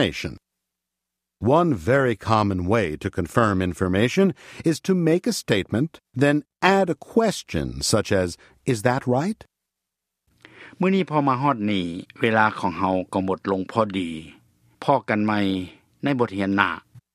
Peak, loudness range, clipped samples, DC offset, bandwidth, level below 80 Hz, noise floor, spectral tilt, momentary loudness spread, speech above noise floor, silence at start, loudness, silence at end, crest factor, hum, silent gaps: -2 dBFS; 3 LU; under 0.1%; under 0.1%; 15.5 kHz; -50 dBFS; -84 dBFS; -5.5 dB/octave; 9 LU; 62 dB; 0 s; -22 LUFS; 0.15 s; 22 dB; none; none